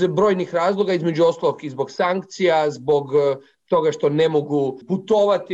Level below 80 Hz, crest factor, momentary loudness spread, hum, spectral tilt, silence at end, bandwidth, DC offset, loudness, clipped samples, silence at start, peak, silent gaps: -62 dBFS; 12 dB; 6 LU; none; -6.5 dB/octave; 0 s; 8 kHz; under 0.1%; -20 LUFS; under 0.1%; 0 s; -8 dBFS; none